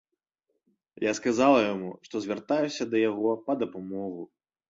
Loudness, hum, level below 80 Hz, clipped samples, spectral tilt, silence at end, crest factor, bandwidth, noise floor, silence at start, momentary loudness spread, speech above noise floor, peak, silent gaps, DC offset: -28 LUFS; none; -70 dBFS; under 0.1%; -5 dB/octave; 0.45 s; 20 dB; 7.8 kHz; -81 dBFS; 1 s; 14 LU; 54 dB; -10 dBFS; none; under 0.1%